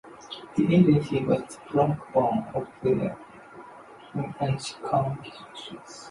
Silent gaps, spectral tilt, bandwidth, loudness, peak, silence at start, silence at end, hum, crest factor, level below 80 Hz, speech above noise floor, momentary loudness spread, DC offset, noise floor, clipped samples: none; -7.5 dB/octave; 11.5 kHz; -26 LUFS; -8 dBFS; 0.05 s; 0 s; none; 20 dB; -56 dBFS; 22 dB; 23 LU; under 0.1%; -47 dBFS; under 0.1%